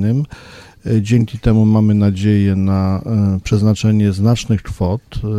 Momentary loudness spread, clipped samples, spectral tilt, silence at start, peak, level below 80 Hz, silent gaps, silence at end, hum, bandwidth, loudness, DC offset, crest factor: 8 LU; under 0.1%; -8 dB/octave; 0 s; -2 dBFS; -34 dBFS; none; 0 s; none; 10 kHz; -15 LUFS; under 0.1%; 12 dB